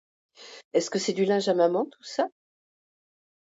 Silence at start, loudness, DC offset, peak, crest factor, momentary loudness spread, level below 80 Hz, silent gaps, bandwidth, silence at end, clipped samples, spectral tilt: 0.4 s; -26 LUFS; under 0.1%; -10 dBFS; 18 dB; 9 LU; -80 dBFS; 0.65-0.71 s; 8 kHz; 1.15 s; under 0.1%; -4.5 dB/octave